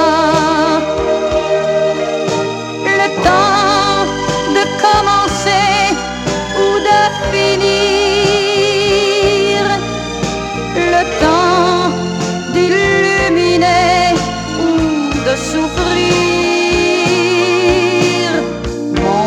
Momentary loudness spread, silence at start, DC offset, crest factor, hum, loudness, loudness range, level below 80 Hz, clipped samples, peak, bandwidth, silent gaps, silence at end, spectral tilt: 7 LU; 0 s; under 0.1%; 12 dB; none; -13 LUFS; 2 LU; -34 dBFS; under 0.1%; 0 dBFS; 13 kHz; none; 0 s; -4 dB/octave